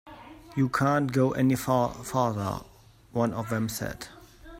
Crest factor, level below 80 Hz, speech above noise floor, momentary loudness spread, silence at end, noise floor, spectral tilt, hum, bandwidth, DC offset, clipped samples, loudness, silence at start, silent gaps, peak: 18 dB; -54 dBFS; 20 dB; 15 LU; 0 s; -47 dBFS; -6.5 dB/octave; none; 16 kHz; under 0.1%; under 0.1%; -27 LUFS; 0.05 s; none; -10 dBFS